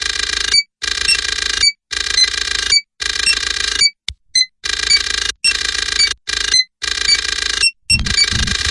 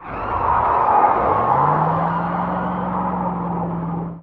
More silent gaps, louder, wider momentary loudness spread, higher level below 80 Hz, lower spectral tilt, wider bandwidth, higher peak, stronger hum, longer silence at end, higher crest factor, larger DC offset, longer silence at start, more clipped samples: neither; first, -14 LUFS vs -19 LUFS; second, 4 LU vs 9 LU; first, -34 dBFS vs -40 dBFS; second, 0.5 dB/octave vs -10 dB/octave; first, 11.5 kHz vs 4.8 kHz; about the same, 0 dBFS vs -2 dBFS; neither; about the same, 0 s vs 0 s; about the same, 16 dB vs 16 dB; neither; about the same, 0 s vs 0 s; neither